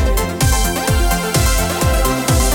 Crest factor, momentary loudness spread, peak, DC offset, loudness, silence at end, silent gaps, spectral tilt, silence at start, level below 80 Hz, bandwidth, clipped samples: 14 dB; 1 LU; -2 dBFS; under 0.1%; -16 LUFS; 0 s; none; -4 dB/octave; 0 s; -18 dBFS; 20 kHz; under 0.1%